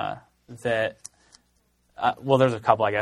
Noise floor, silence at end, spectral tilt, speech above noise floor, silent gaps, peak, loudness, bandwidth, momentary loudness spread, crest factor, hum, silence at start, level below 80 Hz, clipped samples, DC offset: -67 dBFS; 0 s; -6 dB/octave; 44 dB; none; -2 dBFS; -24 LUFS; 12 kHz; 21 LU; 22 dB; none; 0 s; -62 dBFS; under 0.1%; under 0.1%